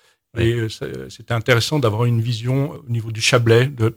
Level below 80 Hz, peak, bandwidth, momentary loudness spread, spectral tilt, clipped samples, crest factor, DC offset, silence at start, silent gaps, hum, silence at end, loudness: -48 dBFS; 0 dBFS; 16 kHz; 13 LU; -5.5 dB/octave; under 0.1%; 18 dB; under 0.1%; 0.35 s; none; none; 0.05 s; -19 LUFS